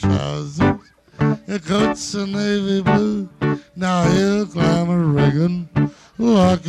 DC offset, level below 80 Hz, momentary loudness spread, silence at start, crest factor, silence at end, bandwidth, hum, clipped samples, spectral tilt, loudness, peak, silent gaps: under 0.1%; -42 dBFS; 7 LU; 0 s; 14 dB; 0 s; 11 kHz; none; under 0.1%; -6.5 dB/octave; -19 LUFS; -4 dBFS; none